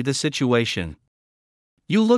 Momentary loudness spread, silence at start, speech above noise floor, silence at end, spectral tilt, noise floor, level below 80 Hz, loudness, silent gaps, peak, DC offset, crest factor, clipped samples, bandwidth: 8 LU; 0 s; over 70 dB; 0 s; -5 dB/octave; under -90 dBFS; -56 dBFS; -22 LUFS; 1.08-1.77 s; -6 dBFS; under 0.1%; 16 dB; under 0.1%; 12 kHz